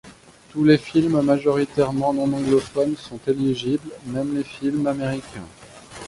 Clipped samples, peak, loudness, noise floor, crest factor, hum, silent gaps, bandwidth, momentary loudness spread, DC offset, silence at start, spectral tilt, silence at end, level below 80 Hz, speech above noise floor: under 0.1%; -4 dBFS; -22 LUFS; -47 dBFS; 18 dB; none; none; 11.5 kHz; 13 LU; under 0.1%; 0.05 s; -7 dB/octave; 0 s; -54 dBFS; 26 dB